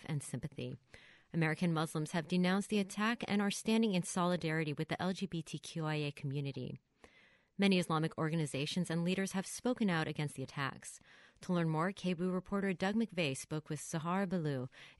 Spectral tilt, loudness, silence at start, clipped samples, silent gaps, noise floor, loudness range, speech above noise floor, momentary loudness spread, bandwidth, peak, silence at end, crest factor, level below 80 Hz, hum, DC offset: -5.5 dB/octave; -37 LUFS; 0 s; under 0.1%; none; -67 dBFS; 3 LU; 31 dB; 10 LU; 11.5 kHz; -18 dBFS; 0.05 s; 18 dB; -70 dBFS; none; under 0.1%